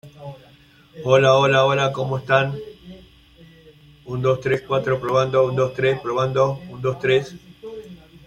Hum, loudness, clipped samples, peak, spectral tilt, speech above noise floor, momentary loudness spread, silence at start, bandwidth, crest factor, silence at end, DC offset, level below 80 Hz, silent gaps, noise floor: none; -20 LUFS; under 0.1%; -2 dBFS; -6 dB/octave; 32 dB; 22 LU; 0.05 s; 9.6 kHz; 18 dB; 0.3 s; under 0.1%; -54 dBFS; none; -51 dBFS